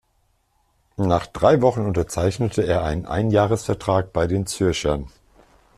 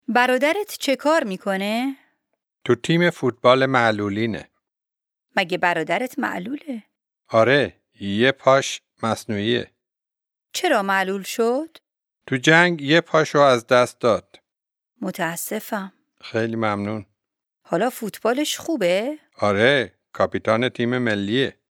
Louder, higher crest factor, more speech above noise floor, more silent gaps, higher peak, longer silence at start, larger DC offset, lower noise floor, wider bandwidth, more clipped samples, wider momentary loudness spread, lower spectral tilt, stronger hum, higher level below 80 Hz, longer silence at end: about the same, -21 LUFS vs -21 LUFS; about the same, 18 dB vs 22 dB; second, 45 dB vs 68 dB; neither; about the same, -2 dBFS vs 0 dBFS; first, 1 s vs 0.1 s; neither; second, -65 dBFS vs -88 dBFS; second, 13.5 kHz vs 19 kHz; neither; second, 7 LU vs 13 LU; first, -6 dB/octave vs -4.5 dB/octave; neither; first, -40 dBFS vs -66 dBFS; first, 0.7 s vs 0.25 s